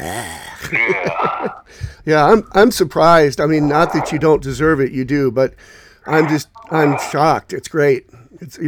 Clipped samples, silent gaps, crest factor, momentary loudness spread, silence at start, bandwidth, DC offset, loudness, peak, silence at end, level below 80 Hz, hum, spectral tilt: under 0.1%; none; 16 dB; 14 LU; 0 s; 19.5 kHz; under 0.1%; -15 LUFS; 0 dBFS; 0 s; -42 dBFS; none; -6 dB/octave